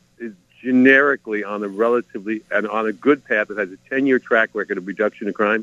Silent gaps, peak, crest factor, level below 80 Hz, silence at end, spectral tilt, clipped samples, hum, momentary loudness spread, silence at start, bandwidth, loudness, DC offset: none; 0 dBFS; 20 dB; -68 dBFS; 0 s; -6.5 dB/octave; under 0.1%; none; 14 LU; 0.2 s; 7.4 kHz; -19 LUFS; under 0.1%